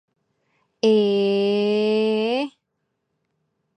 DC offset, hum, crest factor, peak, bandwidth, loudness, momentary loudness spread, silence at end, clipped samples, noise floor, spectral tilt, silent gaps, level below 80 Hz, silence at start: under 0.1%; none; 18 dB; -6 dBFS; 9.2 kHz; -20 LUFS; 6 LU; 1.3 s; under 0.1%; -76 dBFS; -6 dB/octave; none; -76 dBFS; 0.85 s